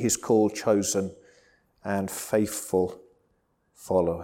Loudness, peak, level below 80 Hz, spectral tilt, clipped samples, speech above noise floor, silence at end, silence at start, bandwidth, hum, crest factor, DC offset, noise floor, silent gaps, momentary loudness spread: -26 LUFS; -10 dBFS; -60 dBFS; -4.5 dB/octave; under 0.1%; 45 dB; 0 s; 0 s; 18 kHz; none; 18 dB; under 0.1%; -70 dBFS; none; 9 LU